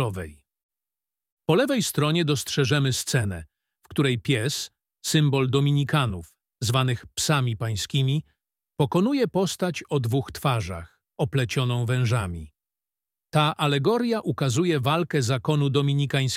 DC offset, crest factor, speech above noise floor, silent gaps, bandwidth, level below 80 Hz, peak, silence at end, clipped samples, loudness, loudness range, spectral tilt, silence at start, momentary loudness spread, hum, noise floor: under 0.1%; 18 dB; over 67 dB; 0.63-0.69 s, 1.32-1.37 s; 16 kHz; -54 dBFS; -6 dBFS; 0 s; under 0.1%; -24 LUFS; 2 LU; -5.5 dB/octave; 0 s; 10 LU; none; under -90 dBFS